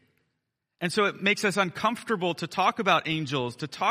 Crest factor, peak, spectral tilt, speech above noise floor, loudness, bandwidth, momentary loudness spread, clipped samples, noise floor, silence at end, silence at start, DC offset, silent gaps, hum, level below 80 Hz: 20 dB; -8 dBFS; -4.5 dB/octave; 55 dB; -26 LUFS; 15 kHz; 6 LU; under 0.1%; -81 dBFS; 0 s; 0.8 s; under 0.1%; none; none; -68 dBFS